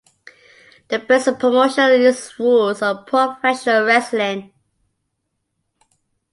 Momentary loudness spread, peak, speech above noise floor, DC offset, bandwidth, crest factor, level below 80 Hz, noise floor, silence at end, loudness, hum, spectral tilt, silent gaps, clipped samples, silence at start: 9 LU; -2 dBFS; 58 dB; under 0.1%; 11.5 kHz; 16 dB; -66 dBFS; -74 dBFS; 1.9 s; -16 LUFS; none; -3.5 dB/octave; none; under 0.1%; 0.9 s